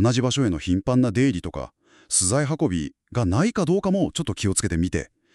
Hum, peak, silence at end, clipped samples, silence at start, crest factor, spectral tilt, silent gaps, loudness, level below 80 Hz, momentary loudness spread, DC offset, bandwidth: none; -6 dBFS; 0.3 s; under 0.1%; 0 s; 16 dB; -5 dB/octave; none; -23 LUFS; -44 dBFS; 10 LU; under 0.1%; 12.5 kHz